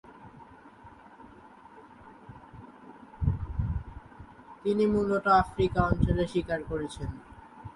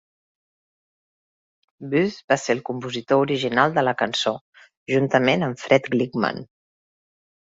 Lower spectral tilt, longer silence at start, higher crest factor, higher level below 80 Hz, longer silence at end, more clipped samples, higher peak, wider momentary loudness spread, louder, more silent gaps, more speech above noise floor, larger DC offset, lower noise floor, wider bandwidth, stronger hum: first, -8 dB/octave vs -5 dB/octave; second, 0.1 s vs 1.8 s; about the same, 22 dB vs 22 dB; first, -42 dBFS vs -64 dBFS; second, 0.05 s vs 0.95 s; neither; second, -10 dBFS vs -2 dBFS; first, 26 LU vs 10 LU; second, -29 LUFS vs -22 LUFS; second, none vs 2.24-2.28 s, 4.41-4.53 s, 4.77-4.86 s; second, 25 dB vs over 69 dB; neither; second, -52 dBFS vs under -90 dBFS; first, 11.5 kHz vs 8 kHz; neither